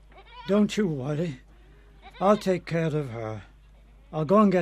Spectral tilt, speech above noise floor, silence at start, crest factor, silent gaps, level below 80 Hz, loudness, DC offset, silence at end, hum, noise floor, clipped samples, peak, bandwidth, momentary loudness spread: -7 dB/octave; 28 dB; 0.15 s; 20 dB; none; -52 dBFS; -26 LUFS; under 0.1%; 0 s; none; -52 dBFS; under 0.1%; -8 dBFS; 11.5 kHz; 15 LU